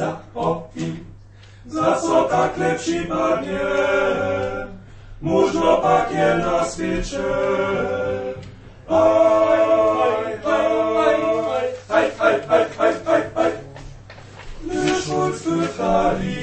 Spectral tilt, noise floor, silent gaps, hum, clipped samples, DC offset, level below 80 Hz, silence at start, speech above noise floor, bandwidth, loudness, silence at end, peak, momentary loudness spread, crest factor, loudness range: -5.5 dB/octave; -43 dBFS; none; none; under 0.1%; under 0.1%; -42 dBFS; 0 s; 24 dB; 8.8 kHz; -20 LUFS; 0 s; -2 dBFS; 13 LU; 18 dB; 4 LU